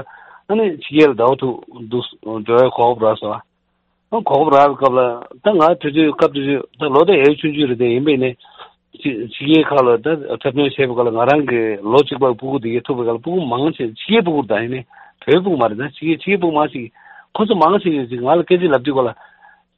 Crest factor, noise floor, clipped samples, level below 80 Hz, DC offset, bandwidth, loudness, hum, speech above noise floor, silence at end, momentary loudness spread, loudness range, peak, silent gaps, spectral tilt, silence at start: 16 dB; -66 dBFS; under 0.1%; -58 dBFS; under 0.1%; 7.2 kHz; -16 LUFS; none; 51 dB; 0.65 s; 11 LU; 3 LU; 0 dBFS; none; -8 dB/octave; 0 s